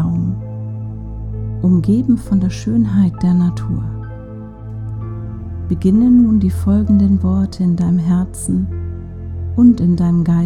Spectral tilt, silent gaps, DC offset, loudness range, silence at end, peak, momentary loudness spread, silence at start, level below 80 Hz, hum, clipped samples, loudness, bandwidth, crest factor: -8.5 dB/octave; none; under 0.1%; 4 LU; 0 s; 0 dBFS; 16 LU; 0 s; -32 dBFS; none; under 0.1%; -15 LUFS; 12 kHz; 14 dB